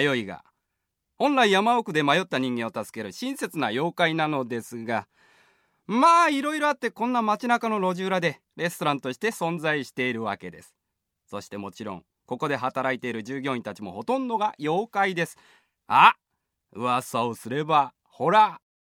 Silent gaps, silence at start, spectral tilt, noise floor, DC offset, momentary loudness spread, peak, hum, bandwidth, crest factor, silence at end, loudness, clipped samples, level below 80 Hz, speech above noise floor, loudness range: none; 0 s; -4.5 dB/octave; -81 dBFS; under 0.1%; 16 LU; -2 dBFS; none; 17 kHz; 24 dB; 0.4 s; -24 LUFS; under 0.1%; -74 dBFS; 56 dB; 8 LU